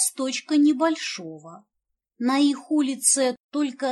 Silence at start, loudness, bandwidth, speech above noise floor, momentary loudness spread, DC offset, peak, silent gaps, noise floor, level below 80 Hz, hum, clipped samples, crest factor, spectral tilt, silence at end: 0 s; -22 LUFS; 13 kHz; 47 dB; 12 LU; under 0.1%; -6 dBFS; 3.44-3.49 s; -70 dBFS; -82 dBFS; none; under 0.1%; 18 dB; -1.5 dB/octave; 0 s